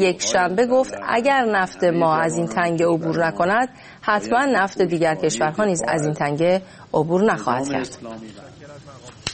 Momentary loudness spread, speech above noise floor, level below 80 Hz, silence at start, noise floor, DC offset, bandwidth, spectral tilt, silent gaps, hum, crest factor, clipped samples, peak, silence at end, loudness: 9 LU; 21 dB; -56 dBFS; 0 s; -41 dBFS; under 0.1%; 8.8 kHz; -4.5 dB/octave; none; none; 18 dB; under 0.1%; -4 dBFS; 0 s; -20 LUFS